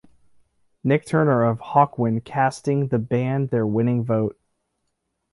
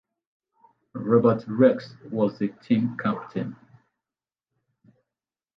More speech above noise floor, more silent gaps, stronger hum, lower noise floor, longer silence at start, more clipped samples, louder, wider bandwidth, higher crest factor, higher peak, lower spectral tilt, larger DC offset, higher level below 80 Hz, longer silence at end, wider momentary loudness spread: second, 55 dB vs over 67 dB; neither; neither; second, -75 dBFS vs under -90 dBFS; about the same, 0.85 s vs 0.95 s; neither; about the same, -22 LUFS vs -24 LUFS; first, 11.5 kHz vs 6 kHz; about the same, 20 dB vs 20 dB; about the same, -4 dBFS vs -6 dBFS; second, -8 dB/octave vs -9.5 dB/octave; neither; first, -60 dBFS vs -68 dBFS; second, 1 s vs 2.05 s; second, 5 LU vs 13 LU